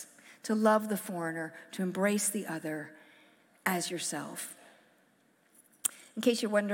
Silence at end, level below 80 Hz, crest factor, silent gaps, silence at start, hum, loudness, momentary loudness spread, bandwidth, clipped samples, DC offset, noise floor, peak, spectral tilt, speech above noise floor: 0 s; -88 dBFS; 26 dB; none; 0 s; none; -32 LUFS; 14 LU; 17 kHz; under 0.1%; under 0.1%; -68 dBFS; -6 dBFS; -4 dB/octave; 36 dB